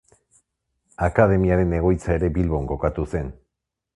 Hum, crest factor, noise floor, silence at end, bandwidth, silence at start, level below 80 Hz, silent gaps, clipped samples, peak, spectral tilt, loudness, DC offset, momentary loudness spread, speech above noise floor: none; 22 dB; -82 dBFS; 0.65 s; 11 kHz; 1 s; -32 dBFS; none; under 0.1%; 0 dBFS; -9.5 dB/octave; -21 LUFS; under 0.1%; 10 LU; 61 dB